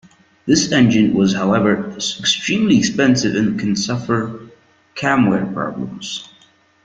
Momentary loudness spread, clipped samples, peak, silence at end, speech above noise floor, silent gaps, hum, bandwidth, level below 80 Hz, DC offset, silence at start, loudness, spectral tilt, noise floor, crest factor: 13 LU; under 0.1%; -2 dBFS; 0.6 s; 36 dB; none; none; 9.2 kHz; -52 dBFS; under 0.1%; 0.45 s; -17 LUFS; -4.5 dB/octave; -53 dBFS; 16 dB